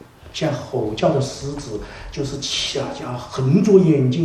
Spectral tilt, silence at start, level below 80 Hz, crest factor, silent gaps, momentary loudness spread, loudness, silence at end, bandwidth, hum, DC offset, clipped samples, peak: -6 dB/octave; 0.25 s; -44 dBFS; 18 dB; none; 16 LU; -20 LUFS; 0 s; 12.5 kHz; none; under 0.1%; under 0.1%; 0 dBFS